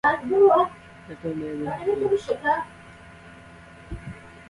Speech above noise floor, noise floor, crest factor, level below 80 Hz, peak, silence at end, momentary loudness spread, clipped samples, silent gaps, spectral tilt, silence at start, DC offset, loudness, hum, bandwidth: 24 dB; -46 dBFS; 18 dB; -52 dBFS; -6 dBFS; 0.1 s; 23 LU; under 0.1%; none; -6.5 dB/octave; 0.05 s; under 0.1%; -23 LUFS; none; 11 kHz